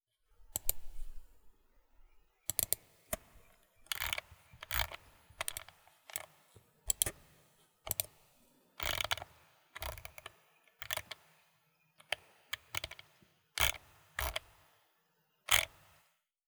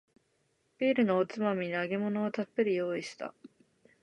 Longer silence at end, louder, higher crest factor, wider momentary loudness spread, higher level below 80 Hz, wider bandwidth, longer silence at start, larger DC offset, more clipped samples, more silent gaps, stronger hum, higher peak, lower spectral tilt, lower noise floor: first, 0.8 s vs 0.55 s; second, -37 LUFS vs -31 LUFS; first, 34 dB vs 16 dB; first, 21 LU vs 11 LU; first, -54 dBFS vs -78 dBFS; first, over 20 kHz vs 10.5 kHz; second, 0.4 s vs 0.8 s; neither; neither; neither; neither; first, -8 dBFS vs -16 dBFS; second, -0.5 dB/octave vs -6.5 dB/octave; about the same, -77 dBFS vs -74 dBFS